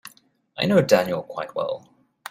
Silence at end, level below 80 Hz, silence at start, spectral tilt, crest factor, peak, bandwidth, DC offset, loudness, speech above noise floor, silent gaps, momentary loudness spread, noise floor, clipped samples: 0 s; -62 dBFS; 0.05 s; -5.5 dB/octave; 20 dB; -4 dBFS; 15.5 kHz; under 0.1%; -22 LUFS; 35 dB; none; 20 LU; -57 dBFS; under 0.1%